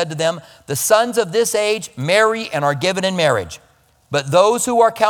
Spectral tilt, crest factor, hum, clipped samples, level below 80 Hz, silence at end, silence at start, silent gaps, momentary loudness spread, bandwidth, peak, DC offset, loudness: -3.5 dB/octave; 16 dB; none; under 0.1%; -56 dBFS; 0 s; 0 s; none; 9 LU; 19 kHz; 0 dBFS; under 0.1%; -17 LUFS